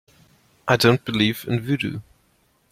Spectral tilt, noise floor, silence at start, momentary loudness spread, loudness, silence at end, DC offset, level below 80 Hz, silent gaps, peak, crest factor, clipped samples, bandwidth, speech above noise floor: -5.5 dB/octave; -63 dBFS; 0.65 s; 13 LU; -21 LUFS; 0.7 s; under 0.1%; -54 dBFS; none; -2 dBFS; 22 dB; under 0.1%; 16.5 kHz; 43 dB